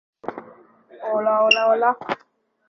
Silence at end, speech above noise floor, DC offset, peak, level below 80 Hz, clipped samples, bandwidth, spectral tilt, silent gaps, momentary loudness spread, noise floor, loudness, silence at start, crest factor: 0.55 s; 30 dB; under 0.1%; -2 dBFS; -72 dBFS; under 0.1%; 6.4 kHz; -3 dB/octave; none; 19 LU; -49 dBFS; -19 LUFS; 0.25 s; 20 dB